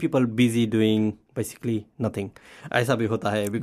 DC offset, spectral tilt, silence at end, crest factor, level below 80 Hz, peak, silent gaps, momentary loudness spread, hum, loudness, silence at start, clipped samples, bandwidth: under 0.1%; -6 dB/octave; 0 s; 16 dB; -60 dBFS; -8 dBFS; none; 11 LU; none; -25 LUFS; 0 s; under 0.1%; 15 kHz